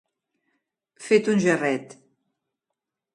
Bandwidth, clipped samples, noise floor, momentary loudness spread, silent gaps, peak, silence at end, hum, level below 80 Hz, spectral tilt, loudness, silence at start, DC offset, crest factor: 11.5 kHz; under 0.1%; -85 dBFS; 11 LU; none; -6 dBFS; 1.3 s; none; -72 dBFS; -5.5 dB/octave; -22 LUFS; 1 s; under 0.1%; 20 dB